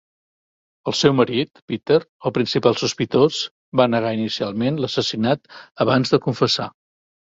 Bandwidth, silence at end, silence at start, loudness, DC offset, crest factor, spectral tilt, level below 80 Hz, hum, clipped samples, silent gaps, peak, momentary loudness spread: 7.8 kHz; 0.55 s; 0.85 s; -20 LUFS; under 0.1%; 18 dB; -5.5 dB/octave; -58 dBFS; none; under 0.1%; 1.62-1.68 s, 2.09-2.19 s, 3.51-3.72 s; -2 dBFS; 7 LU